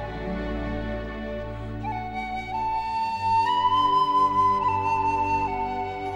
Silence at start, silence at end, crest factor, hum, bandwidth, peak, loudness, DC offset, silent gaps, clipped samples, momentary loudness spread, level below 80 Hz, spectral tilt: 0 s; 0 s; 14 dB; none; 10.5 kHz; -12 dBFS; -25 LUFS; under 0.1%; none; under 0.1%; 12 LU; -40 dBFS; -6 dB/octave